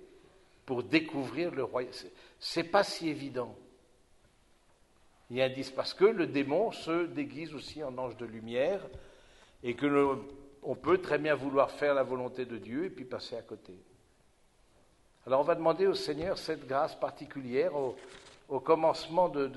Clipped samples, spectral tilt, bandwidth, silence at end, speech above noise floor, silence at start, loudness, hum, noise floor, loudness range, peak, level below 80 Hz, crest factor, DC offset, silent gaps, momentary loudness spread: under 0.1%; -5.5 dB/octave; 11.5 kHz; 0 s; 34 dB; 0 s; -32 LUFS; none; -66 dBFS; 5 LU; -10 dBFS; -64 dBFS; 22 dB; under 0.1%; none; 15 LU